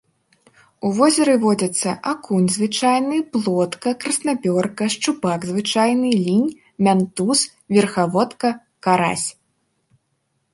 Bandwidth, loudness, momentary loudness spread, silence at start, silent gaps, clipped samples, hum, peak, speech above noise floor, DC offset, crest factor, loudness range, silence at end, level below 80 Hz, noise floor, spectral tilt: 11.5 kHz; -19 LUFS; 7 LU; 0.85 s; none; under 0.1%; none; -2 dBFS; 52 dB; under 0.1%; 16 dB; 2 LU; 1.2 s; -64 dBFS; -70 dBFS; -4.5 dB/octave